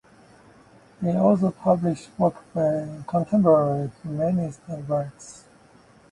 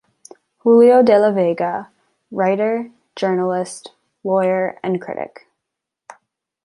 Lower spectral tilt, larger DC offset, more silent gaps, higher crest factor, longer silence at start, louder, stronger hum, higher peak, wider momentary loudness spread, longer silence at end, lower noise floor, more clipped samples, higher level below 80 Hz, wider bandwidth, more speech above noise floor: first, -9 dB/octave vs -6.5 dB/octave; neither; neither; about the same, 18 dB vs 16 dB; first, 1 s vs 0.65 s; second, -23 LUFS vs -17 LUFS; neither; second, -6 dBFS vs -2 dBFS; second, 12 LU vs 19 LU; second, 0.75 s vs 1.35 s; second, -54 dBFS vs -81 dBFS; neither; first, -58 dBFS vs -68 dBFS; about the same, 11 kHz vs 11.5 kHz; second, 31 dB vs 65 dB